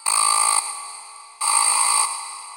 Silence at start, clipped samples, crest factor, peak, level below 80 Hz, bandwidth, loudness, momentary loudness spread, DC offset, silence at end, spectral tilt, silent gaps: 0 s; under 0.1%; 16 dB; -4 dBFS; -76 dBFS; 17 kHz; -17 LUFS; 16 LU; under 0.1%; 0 s; 5 dB/octave; none